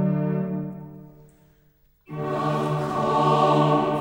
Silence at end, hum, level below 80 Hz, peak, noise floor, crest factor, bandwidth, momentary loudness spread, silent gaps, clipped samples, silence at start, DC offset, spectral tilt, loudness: 0 s; none; -58 dBFS; -8 dBFS; -60 dBFS; 16 dB; 16.5 kHz; 18 LU; none; under 0.1%; 0 s; under 0.1%; -7.5 dB/octave; -23 LUFS